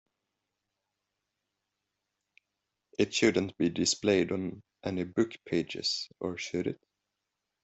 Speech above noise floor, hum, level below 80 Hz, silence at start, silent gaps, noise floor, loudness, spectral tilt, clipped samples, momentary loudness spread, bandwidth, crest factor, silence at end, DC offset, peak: 55 dB; none; -68 dBFS; 3 s; none; -86 dBFS; -31 LUFS; -4 dB/octave; under 0.1%; 11 LU; 8.2 kHz; 22 dB; 0.9 s; under 0.1%; -10 dBFS